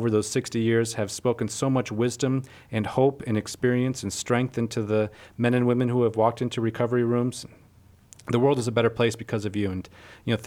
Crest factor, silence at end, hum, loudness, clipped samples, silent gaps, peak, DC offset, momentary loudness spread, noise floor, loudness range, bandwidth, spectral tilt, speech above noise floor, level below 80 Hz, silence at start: 18 dB; 0 s; none; -25 LUFS; under 0.1%; none; -8 dBFS; under 0.1%; 8 LU; -55 dBFS; 1 LU; 16 kHz; -6 dB/octave; 30 dB; -60 dBFS; 0 s